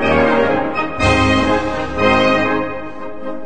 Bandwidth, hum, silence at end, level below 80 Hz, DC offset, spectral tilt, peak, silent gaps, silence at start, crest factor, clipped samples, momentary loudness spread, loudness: 9.2 kHz; none; 0 s; -34 dBFS; 3%; -5.5 dB/octave; 0 dBFS; none; 0 s; 16 dB; under 0.1%; 15 LU; -15 LUFS